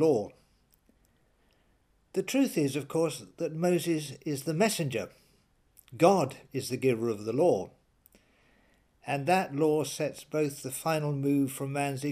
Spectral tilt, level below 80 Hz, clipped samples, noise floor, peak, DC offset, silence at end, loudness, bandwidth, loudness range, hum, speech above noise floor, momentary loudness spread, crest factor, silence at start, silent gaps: -5.5 dB/octave; -70 dBFS; under 0.1%; -68 dBFS; -8 dBFS; under 0.1%; 0 s; -30 LUFS; 15.5 kHz; 3 LU; none; 40 dB; 10 LU; 24 dB; 0 s; none